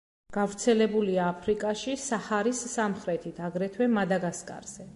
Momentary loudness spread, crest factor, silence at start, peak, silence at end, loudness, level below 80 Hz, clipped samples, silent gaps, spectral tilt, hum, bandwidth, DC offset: 10 LU; 16 dB; 0.3 s; -12 dBFS; 0 s; -29 LUFS; -62 dBFS; under 0.1%; none; -5 dB/octave; none; 11.5 kHz; under 0.1%